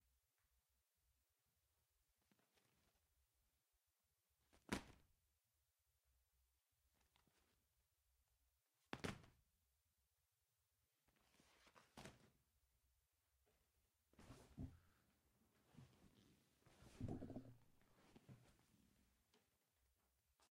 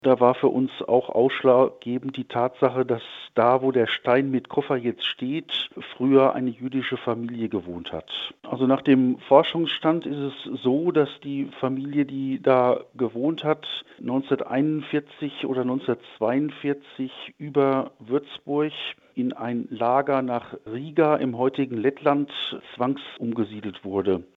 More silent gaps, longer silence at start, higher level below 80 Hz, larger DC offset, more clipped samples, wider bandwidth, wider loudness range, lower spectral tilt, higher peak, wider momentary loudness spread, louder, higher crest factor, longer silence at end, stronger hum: neither; first, 4.55 s vs 0.05 s; second, -76 dBFS vs -70 dBFS; neither; neither; first, 15 kHz vs 4.7 kHz; about the same, 6 LU vs 4 LU; second, -5 dB/octave vs -8 dB/octave; second, -28 dBFS vs -2 dBFS; first, 16 LU vs 12 LU; second, -56 LUFS vs -24 LUFS; first, 36 dB vs 22 dB; about the same, 0.05 s vs 0.15 s; neither